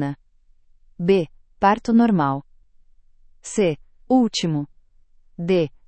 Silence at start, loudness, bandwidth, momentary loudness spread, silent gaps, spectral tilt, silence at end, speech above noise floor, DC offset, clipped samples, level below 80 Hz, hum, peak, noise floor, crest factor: 0 s; -21 LUFS; 8.8 kHz; 16 LU; none; -6 dB/octave; 0.2 s; 36 dB; under 0.1%; under 0.1%; -52 dBFS; none; -4 dBFS; -55 dBFS; 18 dB